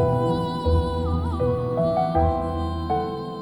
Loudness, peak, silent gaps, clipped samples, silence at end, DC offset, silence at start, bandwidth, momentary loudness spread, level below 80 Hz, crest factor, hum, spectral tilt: -24 LUFS; -10 dBFS; none; under 0.1%; 0 s; 0.1%; 0 s; 10.5 kHz; 4 LU; -32 dBFS; 14 dB; none; -8.5 dB/octave